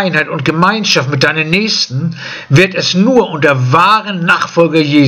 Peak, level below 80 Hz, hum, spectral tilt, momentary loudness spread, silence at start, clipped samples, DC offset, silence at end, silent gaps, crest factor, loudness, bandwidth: 0 dBFS; -50 dBFS; none; -5 dB/octave; 5 LU; 0 s; 0.4%; under 0.1%; 0 s; none; 10 dB; -11 LUFS; 13.5 kHz